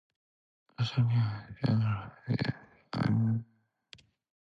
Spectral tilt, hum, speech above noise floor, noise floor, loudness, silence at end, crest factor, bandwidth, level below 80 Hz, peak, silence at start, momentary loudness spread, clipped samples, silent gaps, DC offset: -8 dB/octave; none; 30 dB; -59 dBFS; -32 LUFS; 1 s; 16 dB; 6.4 kHz; -60 dBFS; -16 dBFS; 0.8 s; 8 LU; under 0.1%; none; under 0.1%